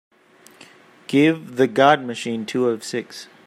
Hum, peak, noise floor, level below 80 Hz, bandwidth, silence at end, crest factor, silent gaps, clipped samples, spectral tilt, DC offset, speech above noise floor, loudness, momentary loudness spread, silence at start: none; -2 dBFS; -51 dBFS; -70 dBFS; 15 kHz; 0.2 s; 20 dB; none; under 0.1%; -5 dB/octave; under 0.1%; 32 dB; -20 LUFS; 12 LU; 1.1 s